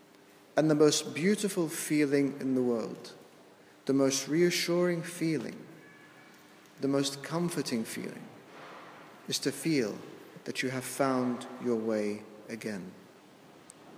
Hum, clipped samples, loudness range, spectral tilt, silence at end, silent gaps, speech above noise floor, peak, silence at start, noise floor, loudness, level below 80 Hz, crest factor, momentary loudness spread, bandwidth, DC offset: none; under 0.1%; 6 LU; -4.5 dB/octave; 0 s; none; 27 dB; -12 dBFS; 0.55 s; -57 dBFS; -31 LUFS; -84 dBFS; 20 dB; 21 LU; 16 kHz; under 0.1%